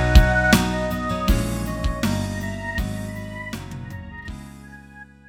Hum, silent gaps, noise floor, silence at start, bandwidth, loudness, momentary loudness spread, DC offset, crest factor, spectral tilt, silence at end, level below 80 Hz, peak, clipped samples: none; none; -44 dBFS; 0 s; 18 kHz; -23 LUFS; 22 LU; under 0.1%; 22 dB; -5.5 dB/octave; 0.25 s; -26 dBFS; 0 dBFS; under 0.1%